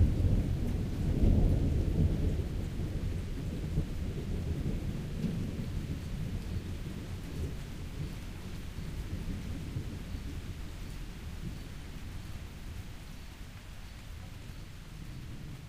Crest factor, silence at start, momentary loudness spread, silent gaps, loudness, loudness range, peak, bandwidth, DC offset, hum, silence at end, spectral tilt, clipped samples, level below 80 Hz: 20 dB; 0 s; 16 LU; none; -37 LUFS; 13 LU; -16 dBFS; 15.5 kHz; under 0.1%; none; 0 s; -7.5 dB/octave; under 0.1%; -38 dBFS